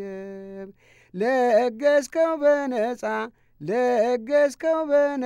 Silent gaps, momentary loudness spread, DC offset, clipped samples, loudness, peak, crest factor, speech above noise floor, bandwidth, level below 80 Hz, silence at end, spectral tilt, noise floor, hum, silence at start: none; 17 LU; under 0.1%; under 0.1%; -22 LUFS; -8 dBFS; 14 dB; 27 dB; 13.5 kHz; -66 dBFS; 0 s; -5 dB/octave; -48 dBFS; none; 0 s